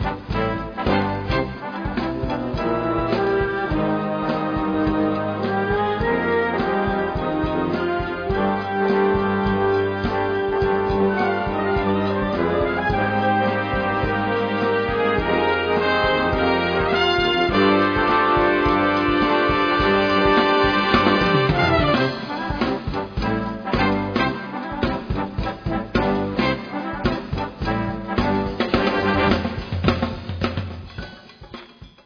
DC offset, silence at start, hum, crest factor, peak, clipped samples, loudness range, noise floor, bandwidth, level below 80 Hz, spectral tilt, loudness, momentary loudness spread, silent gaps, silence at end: under 0.1%; 0 s; none; 18 dB; -2 dBFS; under 0.1%; 6 LU; -42 dBFS; 5.4 kHz; -36 dBFS; -7.5 dB/octave; -21 LUFS; 9 LU; none; 0.15 s